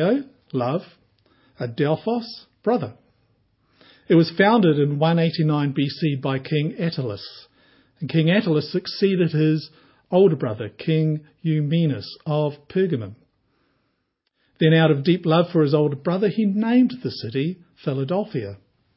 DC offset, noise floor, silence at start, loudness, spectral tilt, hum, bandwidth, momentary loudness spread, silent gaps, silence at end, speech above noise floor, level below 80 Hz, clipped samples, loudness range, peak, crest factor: under 0.1%; -73 dBFS; 0 s; -21 LUFS; -11.5 dB/octave; none; 5.8 kHz; 12 LU; none; 0.4 s; 53 dB; -64 dBFS; under 0.1%; 6 LU; -2 dBFS; 20 dB